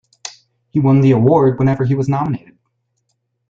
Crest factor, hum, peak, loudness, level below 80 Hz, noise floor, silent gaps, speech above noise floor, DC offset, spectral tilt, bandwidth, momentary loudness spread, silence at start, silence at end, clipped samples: 14 dB; none; -2 dBFS; -14 LUFS; -50 dBFS; -69 dBFS; none; 56 dB; under 0.1%; -8.5 dB/octave; 7.6 kHz; 20 LU; 0.25 s; 1.1 s; under 0.1%